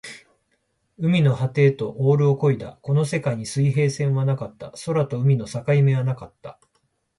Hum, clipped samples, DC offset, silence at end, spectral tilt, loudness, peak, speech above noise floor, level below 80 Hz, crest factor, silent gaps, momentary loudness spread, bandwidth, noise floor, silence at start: none; under 0.1%; under 0.1%; 0.65 s; -7.5 dB/octave; -21 LUFS; -6 dBFS; 49 dB; -58 dBFS; 16 dB; none; 14 LU; 11.5 kHz; -70 dBFS; 0.05 s